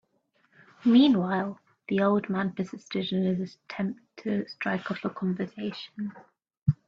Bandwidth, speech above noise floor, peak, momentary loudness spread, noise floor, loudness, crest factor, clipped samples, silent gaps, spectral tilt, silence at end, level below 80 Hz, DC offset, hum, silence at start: 7.2 kHz; 43 dB; -10 dBFS; 14 LU; -70 dBFS; -28 LUFS; 18 dB; under 0.1%; 6.57-6.66 s; -8 dB/octave; 0.15 s; -64 dBFS; under 0.1%; none; 0.85 s